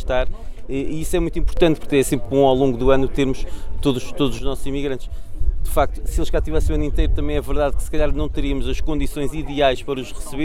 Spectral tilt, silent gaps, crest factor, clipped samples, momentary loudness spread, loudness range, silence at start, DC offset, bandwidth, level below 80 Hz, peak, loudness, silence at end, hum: -6 dB/octave; none; 16 dB; under 0.1%; 11 LU; 4 LU; 0 s; under 0.1%; 14.5 kHz; -24 dBFS; -2 dBFS; -22 LUFS; 0 s; none